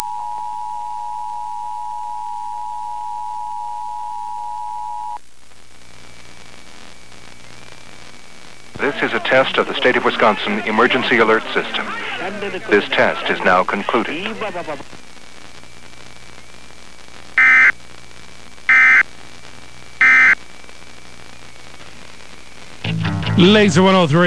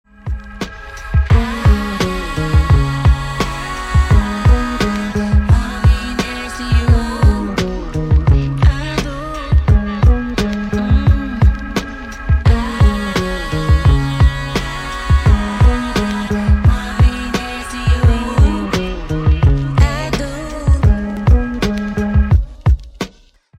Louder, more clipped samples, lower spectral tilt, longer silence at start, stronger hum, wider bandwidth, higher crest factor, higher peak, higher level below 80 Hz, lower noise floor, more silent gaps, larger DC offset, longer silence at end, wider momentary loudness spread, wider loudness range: about the same, -16 LUFS vs -16 LUFS; neither; second, -5 dB/octave vs -6.5 dB/octave; second, 0 s vs 0.25 s; neither; about the same, 11 kHz vs 12 kHz; first, 20 dB vs 12 dB; about the same, 0 dBFS vs 0 dBFS; second, -52 dBFS vs -16 dBFS; about the same, -48 dBFS vs -47 dBFS; neither; first, 2% vs under 0.1%; second, 0 s vs 0.5 s; first, 17 LU vs 9 LU; first, 15 LU vs 1 LU